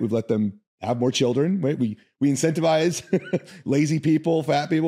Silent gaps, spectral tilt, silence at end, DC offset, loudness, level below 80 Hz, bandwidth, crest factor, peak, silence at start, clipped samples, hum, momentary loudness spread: 0.67-0.78 s; -6 dB/octave; 0 s; under 0.1%; -23 LUFS; -70 dBFS; 15 kHz; 14 dB; -8 dBFS; 0 s; under 0.1%; none; 8 LU